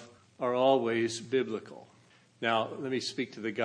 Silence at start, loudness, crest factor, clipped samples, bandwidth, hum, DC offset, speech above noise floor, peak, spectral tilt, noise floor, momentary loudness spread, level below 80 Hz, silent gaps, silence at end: 0 s; -31 LUFS; 18 dB; under 0.1%; 10.5 kHz; none; under 0.1%; 31 dB; -12 dBFS; -4.5 dB/octave; -62 dBFS; 10 LU; -82 dBFS; none; 0 s